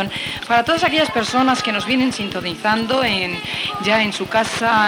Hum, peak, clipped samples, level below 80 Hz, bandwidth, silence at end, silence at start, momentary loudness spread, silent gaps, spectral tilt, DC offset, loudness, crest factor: none; -2 dBFS; under 0.1%; -52 dBFS; 17.5 kHz; 0 s; 0 s; 6 LU; none; -3.5 dB/octave; under 0.1%; -18 LUFS; 16 dB